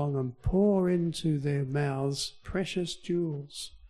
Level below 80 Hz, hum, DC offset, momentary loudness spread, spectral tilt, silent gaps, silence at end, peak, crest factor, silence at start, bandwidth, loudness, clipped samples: -48 dBFS; none; under 0.1%; 9 LU; -6.5 dB/octave; none; 0 s; -14 dBFS; 14 dB; 0 s; 13 kHz; -30 LUFS; under 0.1%